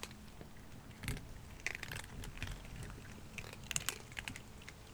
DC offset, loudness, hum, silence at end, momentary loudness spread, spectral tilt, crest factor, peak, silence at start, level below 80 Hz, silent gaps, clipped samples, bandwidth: under 0.1%; -46 LUFS; none; 0 s; 15 LU; -2.5 dB/octave; 32 dB; -14 dBFS; 0 s; -54 dBFS; none; under 0.1%; over 20 kHz